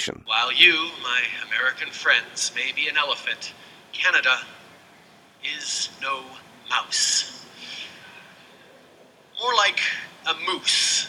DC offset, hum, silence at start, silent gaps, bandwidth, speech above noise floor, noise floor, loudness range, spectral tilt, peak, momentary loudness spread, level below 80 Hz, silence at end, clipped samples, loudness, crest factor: under 0.1%; none; 0 s; none; 17 kHz; 29 dB; -52 dBFS; 6 LU; 1 dB/octave; 0 dBFS; 18 LU; -72 dBFS; 0 s; under 0.1%; -21 LUFS; 24 dB